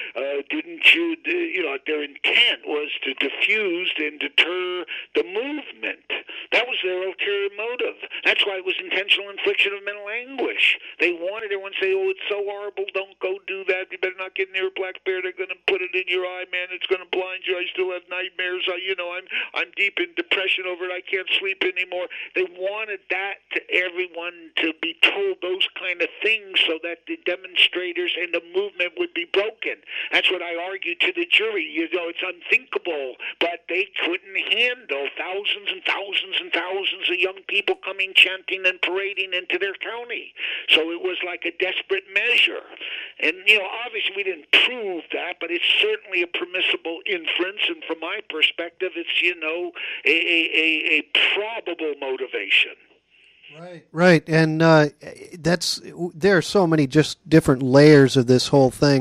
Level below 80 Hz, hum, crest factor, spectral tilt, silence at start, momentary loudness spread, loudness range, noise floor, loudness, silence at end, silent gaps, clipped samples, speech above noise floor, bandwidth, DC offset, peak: -62 dBFS; none; 20 dB; -4.5 dB/octave; 0 s; 12 LU; 5 LU; -56 dBFS; -21 LUFS; 0 s; none; under 0.1%; 34 dB; 14.5 kHz; under 0.1%; -2 dBFS